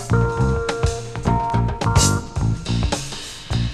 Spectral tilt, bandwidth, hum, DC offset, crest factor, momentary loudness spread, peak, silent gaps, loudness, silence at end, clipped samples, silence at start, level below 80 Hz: -5 dB/octave; 13.5 kHz; none; under 0.1%; 16 dB; 9 LU; -4 dBFS; none; -21 LUFS; 0 s; under 0.1%; 0 s; -28 dBFS